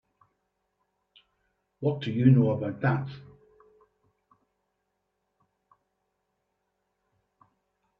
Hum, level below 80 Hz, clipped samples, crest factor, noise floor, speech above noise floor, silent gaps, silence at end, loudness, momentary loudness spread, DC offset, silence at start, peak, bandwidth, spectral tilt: none; -66 dBFS; under 0.1%; 24 dB; -80 dBFS; 55 dB; none; 4.8 s; -26 LUFS; 15 LU; under 0.1%; 1.8 s; -8 dBFS; 5.4 kHz; -10 dB/octave